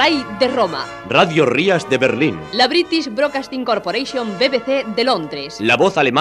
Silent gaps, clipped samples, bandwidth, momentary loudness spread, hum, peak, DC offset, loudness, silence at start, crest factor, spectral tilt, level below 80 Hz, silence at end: none; under 0.1%; 12.5 kHz; 7 LU; 50 Hz at -55 dBFS; 0 dBFS; under 0.1%; -17 LUFS; 0 s; 16 dB; -4.5 dB/octave; -54 dBFS; 0 s